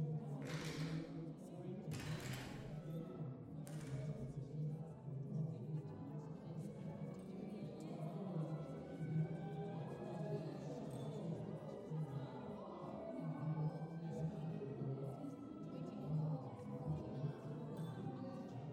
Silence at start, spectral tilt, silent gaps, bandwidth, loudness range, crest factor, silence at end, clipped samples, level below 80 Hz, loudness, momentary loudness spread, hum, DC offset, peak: 0 s; -7.5 dB/octave; none; 13.5 kHz; 2 LU; 16 dB; 0 s; under 0.1%; -72 dBFS; -48 LUFS; 6 LU; none; under 0.1%; -32 dBFS